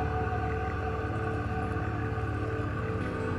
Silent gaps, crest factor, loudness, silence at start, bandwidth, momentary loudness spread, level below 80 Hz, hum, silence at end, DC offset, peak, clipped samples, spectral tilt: none; 12 dB; -32 LUFS; 0 s; 10.5 kHz; 2 LU; -40 dBFS; none; 0 s; under 0.1%; -20 dBFS; under 0.1%; -8 dB/octave